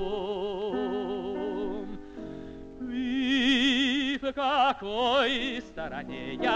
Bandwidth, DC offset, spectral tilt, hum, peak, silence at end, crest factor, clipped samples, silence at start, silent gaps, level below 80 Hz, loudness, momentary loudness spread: 9 kHz; under 0.1%; -4 dB/octave; none; -14 dBFS; 0 s; 16 dB; under 0.1%; 0 s; none; -52 dBFS; -28 LUFS; 17 LU